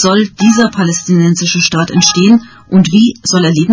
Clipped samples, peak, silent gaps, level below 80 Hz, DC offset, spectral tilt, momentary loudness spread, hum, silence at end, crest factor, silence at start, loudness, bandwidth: 0.4%; 0 dBFS; none; -46 dBFS; under 0.1%; -4.5 dB/octave; 4 LU; none; 0 s; 10 dB; 0 s; -10 LUFS; 8 kHz